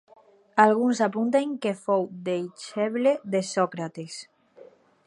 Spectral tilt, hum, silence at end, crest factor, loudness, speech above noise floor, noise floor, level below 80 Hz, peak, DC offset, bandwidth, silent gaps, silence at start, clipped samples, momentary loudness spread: -5.5 dB/octave; none; 0.45 s; 22 dB; -25 LUFS; 28 dB; -52 dBFS; -80 dBFS; -4 dBFS; under 0.1%; 11.5 kHz; none; 0.55 s; under 0.1%; 14 LU